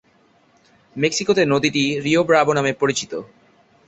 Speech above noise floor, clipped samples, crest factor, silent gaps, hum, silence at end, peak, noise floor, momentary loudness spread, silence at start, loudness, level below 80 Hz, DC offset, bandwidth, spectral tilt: 39 dB; under 0.1%; 18 dB; none; none; 0.6 s; -2 dBFS; -57 dBFS; 12 LU; 0.95 s; -18 LUFS; -58 dBFS; under 0.1%; 8.2 kHz; -4 dB/octave